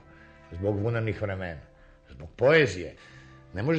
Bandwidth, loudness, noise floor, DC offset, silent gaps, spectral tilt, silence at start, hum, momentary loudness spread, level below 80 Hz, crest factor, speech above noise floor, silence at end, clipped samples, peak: 8.8 kHz; -27 LUFS; -52 dBFS; under 0.1%; none; -6.5 dB/octave; 0.5 s; none; 24 LU; -54 dBFS; 22 dB; 25 dB; 0 s; under 0.1%; -8 dBFS